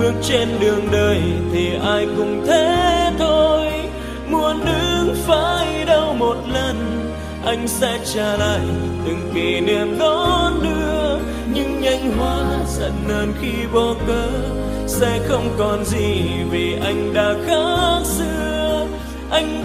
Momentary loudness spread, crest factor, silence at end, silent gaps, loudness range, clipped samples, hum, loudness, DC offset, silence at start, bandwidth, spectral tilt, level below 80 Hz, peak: 6 LU; 16 dB; 0 s; none; 3 LU; under 0.1%; none; -19 LUFS; under 0.1%; 0 s; 15.5 kHz; -5 dB/octave; -30 dBFS; -2 dBFS